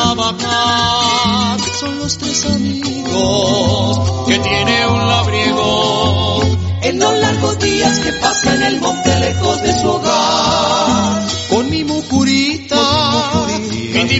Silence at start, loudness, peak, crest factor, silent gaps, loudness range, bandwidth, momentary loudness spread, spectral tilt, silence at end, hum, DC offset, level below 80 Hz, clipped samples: 0 s; -14 LUFS; 0 dBFS; 14 dB; none; 1 LU; 8.2 kHz; 5 LU; -4 dB/octave; 0 s; none; under 0.1%; -36 dBFS; under 0.1%